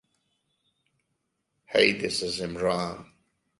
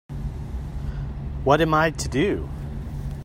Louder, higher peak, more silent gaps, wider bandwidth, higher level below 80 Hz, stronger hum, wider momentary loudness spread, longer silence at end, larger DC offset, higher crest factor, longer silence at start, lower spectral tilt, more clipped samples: about the same, -26 LUFS vs -25 LUFS; about the same, -4 dBFS vs -2 dBFS; neither; second, 11.5 kHz vs 16 kHz; second, -60 dBFS vs -34 dBFS; neither; second, 11 LU vs 14 LU; first, 0.55 s vs 0 s; neither; about the same, 26 dB vs 22 dB; first, 1.7 s vs 0.1 s; second, -3.5 dB/octave vs -6 dB/octave; neither